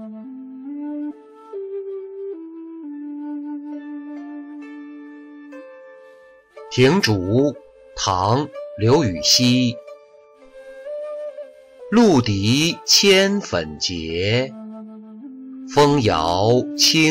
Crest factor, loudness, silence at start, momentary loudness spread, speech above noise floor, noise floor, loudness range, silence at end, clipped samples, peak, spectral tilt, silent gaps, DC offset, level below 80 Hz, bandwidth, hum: 18 dB; -18 LUFS; 0 s; 23 LU; 31 dB; -48 dBFS; 16 LU; 0 s; under 0.1%; -4 dBFS; -4 dB/octave; none; under 0.1%; -50 dBFS; 16 kHz; none